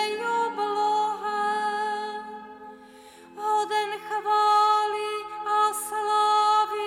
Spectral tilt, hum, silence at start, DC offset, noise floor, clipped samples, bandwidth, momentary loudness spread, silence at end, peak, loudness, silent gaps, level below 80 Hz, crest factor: -1 dB/octave; none; 0 s; under 0.1%; -48 dBFS; under 0.1%; 16 kHz; 14 LU; 0 s; -12 dBFS; -25 LUFS; none; -72 dBFS; 14 dB